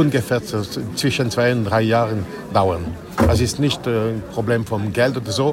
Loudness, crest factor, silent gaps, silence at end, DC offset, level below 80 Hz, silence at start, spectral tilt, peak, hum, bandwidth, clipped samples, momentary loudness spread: -20 LUFS; 16 dB; none; 0 s; under 0.1%; -40 dBFS; 0 s; -5.5 dB/octave; -4 dBFS; none; 16.5 kHz; under 0.1%; 7 LU